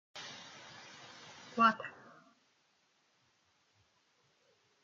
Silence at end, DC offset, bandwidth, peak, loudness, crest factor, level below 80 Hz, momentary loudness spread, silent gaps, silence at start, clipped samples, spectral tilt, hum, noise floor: 2.95 s; under 0.1%; 7.6 kHz; -16 dBFS; -32 LUFS; 26 dB; under -90 dBFS; 22 LU; none; 0.15 s; under 0.1%; -3.5 dB/octave; none; -75 dBFS